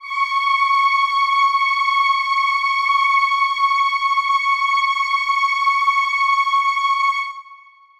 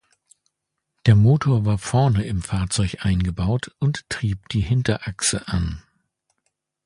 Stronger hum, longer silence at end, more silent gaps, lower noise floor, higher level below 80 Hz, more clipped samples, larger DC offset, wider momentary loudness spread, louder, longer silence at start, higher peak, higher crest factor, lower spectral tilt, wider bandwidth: neither; second, 0.45 s vs 1.05 s; neither; second, -45 dBFS vs -79 dBFS; second, -66 dBFS vs -36 dBFS; neither; neither; second, 3 LU vs 9 LU; first, -16 LUFS vs -21 LUFS; second, 0 s vs 1.05 s; second, -6 dBFS vs -2 dBFS; second, 12 dB vs 20 dB; second, 5 dB/octave vs -5.5 dB/octave; about the same, 12 kHz vs 11.5 kHz